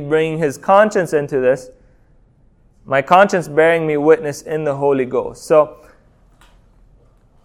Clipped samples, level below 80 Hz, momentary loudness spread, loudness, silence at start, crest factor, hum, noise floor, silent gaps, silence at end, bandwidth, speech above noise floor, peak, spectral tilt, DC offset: under 0.1%; -52 dBFS; 9 LU; -15 LUFS; 0 s; 16 dB; none; -52 dBFS; none; 1.7 s; 14.5 kHz; 37 dB; 0 dBFS; -6 dB/octave; under 0.1%